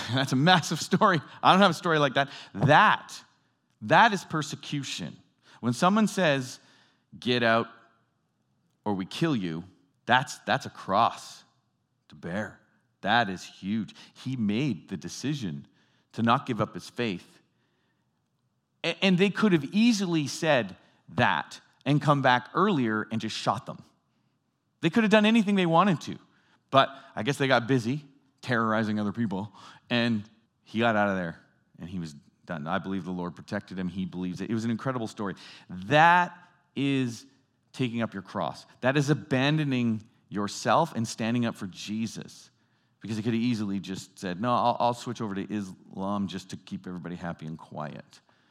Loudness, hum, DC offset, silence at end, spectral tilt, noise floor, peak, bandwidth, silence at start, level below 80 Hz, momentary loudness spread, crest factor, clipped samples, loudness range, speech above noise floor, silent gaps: -27 LUFS; none; under 0.1%; 0.5 s; -5.5 dB/octave; -75 dBFS; -4 dBFS; 14 kHz; 0 s; -76 dBFS; 17 LU; 24 dB; under 0.1%; 7 LU; 48 dB; none